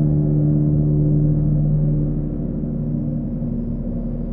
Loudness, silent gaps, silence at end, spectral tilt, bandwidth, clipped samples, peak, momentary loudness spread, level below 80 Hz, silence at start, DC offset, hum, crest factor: -20 LUFS; none; 0 s; -15 dB/octave; 1.5 kHz; under 0.1%; -6 dBFS; 8 LU; -28 dBFS; 0 s; under 0.1%; none; 12 dB